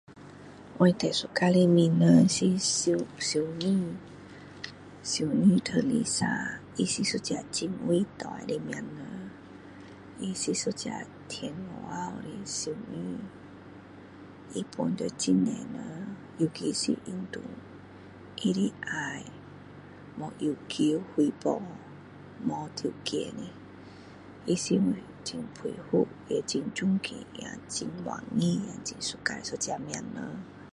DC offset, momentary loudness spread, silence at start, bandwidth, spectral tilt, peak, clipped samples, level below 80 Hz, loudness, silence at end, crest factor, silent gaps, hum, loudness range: under 0.1%; 23 LU; 0.1 s; 11.5 kHz; -5 dB/octave; -8 dBFS; under 0.1%; -64 dBFS; -29 LUFS; 0.05 s; 22 dB; none; none; 11 LU